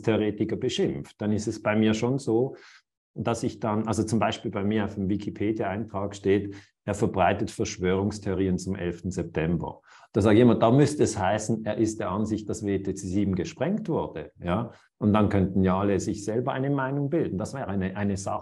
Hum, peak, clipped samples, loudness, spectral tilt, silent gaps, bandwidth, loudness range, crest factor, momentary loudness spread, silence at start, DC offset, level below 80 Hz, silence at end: none; -6 dBFS; under 0.1%; -26 LUFS; -6.5 dB/octave; 2.97-3.14 s; 12 kHz; 4 LU; 20 dB; 8 LU; 0 s; under 0.1%; -54 dBFS; 0 s